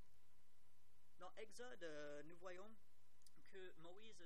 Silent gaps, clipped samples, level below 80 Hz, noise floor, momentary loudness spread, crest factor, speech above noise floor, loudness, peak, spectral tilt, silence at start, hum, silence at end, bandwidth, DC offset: none; under 0.1%; -86 dBFS; -81 dBFS; 9 LU; 18 dB; 21 dB; -60 LUFS; -40 dBFS; -4 dB/octave; 0 s; none; 0 s; 15 kHz; 0.3%